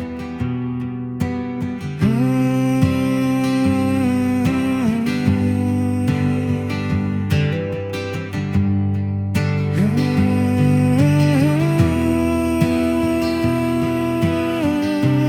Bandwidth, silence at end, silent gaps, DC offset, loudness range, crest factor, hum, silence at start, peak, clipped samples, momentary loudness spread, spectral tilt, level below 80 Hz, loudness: 16.5 kHz; 0 s; none; under 0.1%; 4 LU; 14 dB; none; 0 s; -2 dBFS; under 0.1%; 8 LU; -7.5 dB/octave; -44 dBFS; -19 LUFS